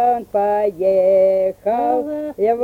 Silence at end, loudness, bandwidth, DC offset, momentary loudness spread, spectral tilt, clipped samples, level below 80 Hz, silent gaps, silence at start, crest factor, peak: 0 s; -17 LUFS; 15.5 kHz; under 0.1%; 6 LU; -7.5 dB/octave; under 0.1%; -54 dBFS; none; 0 s; 10 dB; -6 dBFS